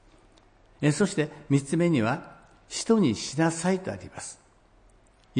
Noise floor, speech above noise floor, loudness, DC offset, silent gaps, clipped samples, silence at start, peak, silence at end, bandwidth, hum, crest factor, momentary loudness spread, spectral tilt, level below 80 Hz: -59 dBFS; 33 dB; -26 LUFS; under 0.1%; none; under 0.1%; 0.8 s; -10 dBFS; 0 s; 10.5 kHz; none; 18 dB; 14 LU; -5.5 dB/octave; -60 dBFS